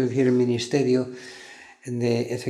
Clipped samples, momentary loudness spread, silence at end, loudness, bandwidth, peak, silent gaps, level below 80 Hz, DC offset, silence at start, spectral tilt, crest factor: under 0.1%; 20 LU; 0 s; -23 LUFS; 12.5 kHz; -8 dBFS; none; -68 dBFS; under 0.1%; 0 s; -6.5 dB/octave; 16 dB